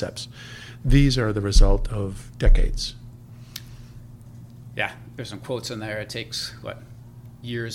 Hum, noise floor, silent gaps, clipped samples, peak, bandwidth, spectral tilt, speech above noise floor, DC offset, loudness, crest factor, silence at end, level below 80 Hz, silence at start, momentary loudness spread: none; -43 dBFS; none; under 0.1%; -2 dBFS; 12.5 kHz; -5.5 dB/octave; 22 dB; under 0.1%; -25 LUFS; 20 dB; 0 s; -24 dBFS; 0 s; 23 LU